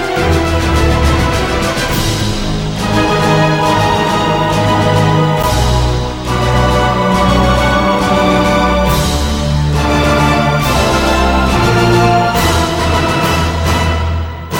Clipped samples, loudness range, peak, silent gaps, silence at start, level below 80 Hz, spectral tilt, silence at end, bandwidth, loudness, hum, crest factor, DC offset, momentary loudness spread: under 0.1%; 2 LU; 0 dBFS; none; 0 s; -20 dBFS; -5.5 dB/octave; 0 s; 17.5 kHz; -12 LUFS; none; 12 dB; under 0.1%; 4 LU